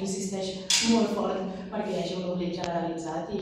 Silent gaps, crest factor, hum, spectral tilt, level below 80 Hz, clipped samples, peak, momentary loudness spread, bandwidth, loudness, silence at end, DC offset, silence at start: none; 20 dB; none; -3.5 dB/octave; -58 dBFS; under 0.1%; -10 dBFS; 11 LU; 15.5 kHz; -28 LUFS; 0 s; under 0.1%; 0 s